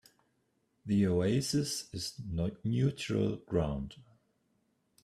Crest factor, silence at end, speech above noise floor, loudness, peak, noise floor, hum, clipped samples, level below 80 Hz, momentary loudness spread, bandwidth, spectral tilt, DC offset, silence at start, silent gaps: 18 dB; 1 s; 44 dB; -33 LUFS; -16 dBFS; -76 dBFS; none; under 0.1%; -54 dBFS; 10 LU; 14.5 kHz; -6 dB/octave; under 0.1%; 0.85 s; none